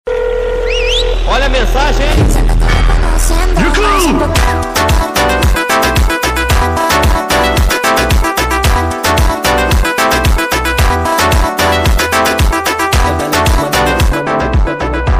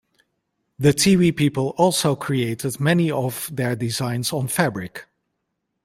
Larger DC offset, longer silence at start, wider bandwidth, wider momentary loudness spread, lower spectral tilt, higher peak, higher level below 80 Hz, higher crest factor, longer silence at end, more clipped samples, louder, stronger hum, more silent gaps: first, 0.5% vs under 0.1%; second, 0.05 s vs 0.8 s; about the same, 16 kHz vs 16.5 kHz; second, 3 LU vs 9 LU; about the same, -4 dB/octave vs -5 dB/octave; about the same, 0 dBFS vs -2 dBFS; first, -14 dBFS vs -54 dBFS; second, 10 dB vs 18 dB; second, 0 s vs 0.8 s; neither; first, -11 LUFS vs -20 LUFS; neither; neither